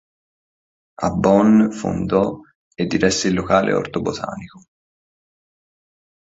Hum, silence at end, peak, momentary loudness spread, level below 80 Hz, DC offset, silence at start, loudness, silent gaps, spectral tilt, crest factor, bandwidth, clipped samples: none; 1.75 s; -2 dBFS; 13 LU; -46 dBFS; under 0.1%; 1 s; -18 LUFS; 2.55-2.71 s; -5.5 dB/octave; 18 dB; 8 kHz; under 0.1%